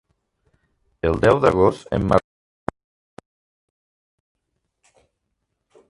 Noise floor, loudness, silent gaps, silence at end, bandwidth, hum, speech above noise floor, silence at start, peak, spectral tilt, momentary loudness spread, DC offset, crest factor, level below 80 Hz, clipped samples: -76 dBFS; -19 LUFS; none; 3.7 s; 11.5 kHz; none; 59 dB; 1.05 s; 0 dBFS; -7.5 dB/octave; 17 LU; under 0.1%; 24 dB; -42 dBFS; under 0.1%